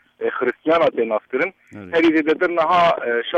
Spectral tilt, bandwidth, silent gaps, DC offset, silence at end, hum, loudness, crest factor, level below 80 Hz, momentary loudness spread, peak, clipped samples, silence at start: -6 dB/octave; 7.4 kHz; none; under 0.1%; 0 s; none; -19 LUFS; 12 dB; -60 dBFS; 7 LU; -8 dBFS; under 0.1%; 0.2 s